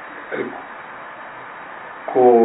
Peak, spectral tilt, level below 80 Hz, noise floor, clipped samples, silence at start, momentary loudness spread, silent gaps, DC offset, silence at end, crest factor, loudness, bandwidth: -2 dBFS; -10.5 dB/octave; -68 dBFS; -35 dBFS; under 0.1%; 0 s; 19 LU; none; under 0.1%; 0 s; 18 dB; -21 LUFS; 4 kHz